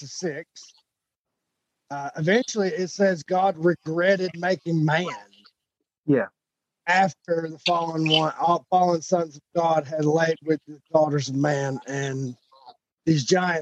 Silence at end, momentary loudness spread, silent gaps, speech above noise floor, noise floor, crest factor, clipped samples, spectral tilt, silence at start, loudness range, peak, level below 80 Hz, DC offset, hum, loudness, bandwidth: 0 s; 11 LU; 1.19-1.25 s, 5.98-6.03 s, 12.93-12.97 s; 61 dB; -84 dBFS; 18 dB; under 0.1%; -5 dB/octave; 0 s; 3 LU; -6 dBFS; -72 dBFS; under 0.1%; none; -24 LUFS; 8.6 kHz